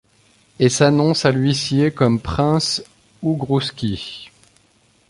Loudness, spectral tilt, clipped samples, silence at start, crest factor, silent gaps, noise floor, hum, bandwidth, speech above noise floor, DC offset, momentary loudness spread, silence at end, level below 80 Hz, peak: -18 LUFS; -5.5 dB/octave; under 0.1%; 0.6 s; 18 dB; none; -57 dBFS; none; 11.5 kHz; 40 dB; under 0.1%; 11 LU; 0.85 s; -44 dBFS; -2 dBFS